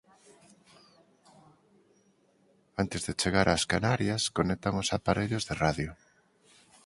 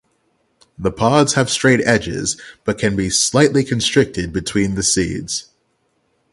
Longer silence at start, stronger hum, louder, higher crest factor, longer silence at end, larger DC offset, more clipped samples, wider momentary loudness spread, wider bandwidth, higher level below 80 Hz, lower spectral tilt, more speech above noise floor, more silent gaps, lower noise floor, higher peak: first, 2.75 s vs 0.8 s; neither; second, -29 LUFS vs -17 LUFS; first, 24 dB vs 18 dB; about the same, 0.9 s vs 0.9 s; neither; neither; second, 8 LU vs 11 LU; about the same, 11.5 kHz vs 11.5 kHz; second, -50 dBFS vs -42 dBFS; about the same, -4.5 dB/octave vs -4 dB/octave; second, 38 dB vs 48 dB; neither; about the same, -67 dBFS vs -65 dBFS; second, -8 dBFS vs 0 dBFS